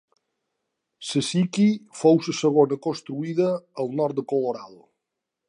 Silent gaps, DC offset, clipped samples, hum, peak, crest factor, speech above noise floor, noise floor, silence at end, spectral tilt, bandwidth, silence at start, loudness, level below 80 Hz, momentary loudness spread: none; under 0.1%; under 0.1%; none; -6 dBFS; 20 dB; 61 dB; -83 dBFS; 0.75 s; -6 dB/octave; 11 kHz; 1 s; -23 LUFS; -74 dBFS; 10 LU